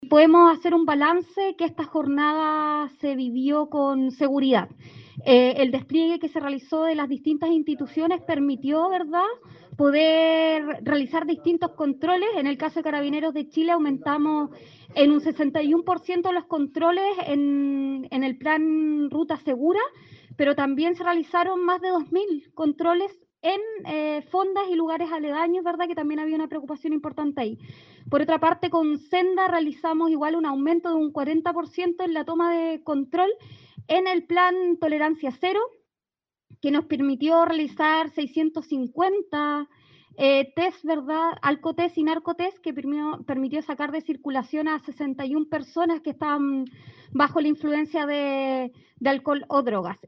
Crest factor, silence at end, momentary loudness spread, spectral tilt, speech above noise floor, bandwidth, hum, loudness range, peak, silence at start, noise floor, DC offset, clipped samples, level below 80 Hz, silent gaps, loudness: 20 dB; 0.15 s; 8 LU; -7 dB/octave; over 67 dB; 6 kHz; none; 4 LU; -4 dBFS; 0 s; under -90 dBFS; under 0.1%; under 0.1%; -74 dBFS; none; -24 LUFS